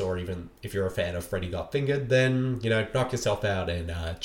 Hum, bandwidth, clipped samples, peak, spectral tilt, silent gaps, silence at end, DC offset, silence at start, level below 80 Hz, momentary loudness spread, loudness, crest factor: none; 17 kHz; under 0.1%; -12 dBFS; -6 dB/octave; none; 0 s; under 0.1%; 0 s; -46 dBFS; 10 LU; -28 LUFS; 16 dB